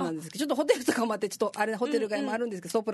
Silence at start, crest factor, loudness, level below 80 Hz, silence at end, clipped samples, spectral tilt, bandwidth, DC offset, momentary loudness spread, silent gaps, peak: 0 s; 20 dB; -29 LUFS; -76 dBFS; 0 s; under 0.1%; -4 dB/octave; 12.5 kHz; under 0.1%; 6 LU; none; -10 dBFS